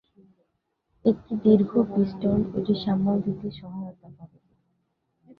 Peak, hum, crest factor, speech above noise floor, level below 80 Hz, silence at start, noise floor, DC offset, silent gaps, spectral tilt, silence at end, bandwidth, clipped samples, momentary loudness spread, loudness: -6 dBFS; none; 20 dB; 52 dB; -56 dBFS; 1.05 s; -76 dBFS; under 0.1%; none; -11 dB/octave; 0.05 s; 5.4 kHz; under 0.1%; 17 LU; -24 LUFS